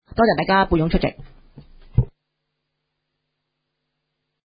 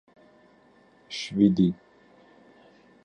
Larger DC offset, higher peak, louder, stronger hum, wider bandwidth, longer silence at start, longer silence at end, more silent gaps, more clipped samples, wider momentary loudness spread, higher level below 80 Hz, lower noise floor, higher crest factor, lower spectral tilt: neither; first, -2 dBFS vs -8 dBFS; first, -20 LUFS vs -25 LUFS; neither; second, 5.2 kHz vs 9.4 kHz; second, 0.15 s vs 1.1 s; first, 2.4 s vs 1.3 s; neither; neither; second, 9 LU vs 17 LU; first, -36 dBFS vs -60 dBFS; first, -77 dBFS vs -58 dBFS; about the same, 20 dB vs 20 dB; first, -11.5 dB/octave vs -7 dB/octave